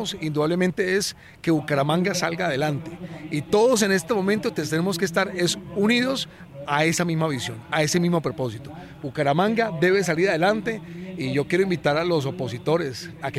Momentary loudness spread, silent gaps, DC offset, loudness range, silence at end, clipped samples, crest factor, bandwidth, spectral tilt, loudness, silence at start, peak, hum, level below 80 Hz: 11 LU; none; under 0.1%; 2 LU; 0 s; under 0.1%; 16 dB; 15.5 kHz; -5 dB/octave; -23 LUFS; 0 s; -6 dBFS; none; -58 dBFS